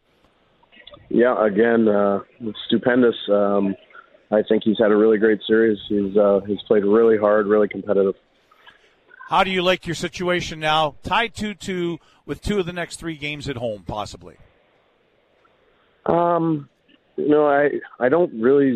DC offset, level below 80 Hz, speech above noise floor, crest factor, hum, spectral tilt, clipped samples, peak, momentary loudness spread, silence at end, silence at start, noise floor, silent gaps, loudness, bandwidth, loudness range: under 0.1%; -50 dBFS; 42 dB; 18 dB; none; -6 dB/octave; under 0.1%; -4 dBFS; 12 LU; 0 s; 1.1 s; -61 dBFS; none; -20 LUFS; 11.5 kHz; 10 LU